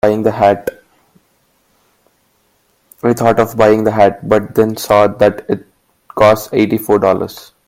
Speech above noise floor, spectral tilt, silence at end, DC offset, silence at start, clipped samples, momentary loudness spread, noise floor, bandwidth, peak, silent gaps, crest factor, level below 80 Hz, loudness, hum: 46 dB; -6 dB/octave; 0.25 s; under 0.1%; 0.05 s; under 0.1%; 11 LU; -58 dBFS; 17 kHz; 0 dBFS; none; 14 dB; -48 dBFS; -13 LUFS; none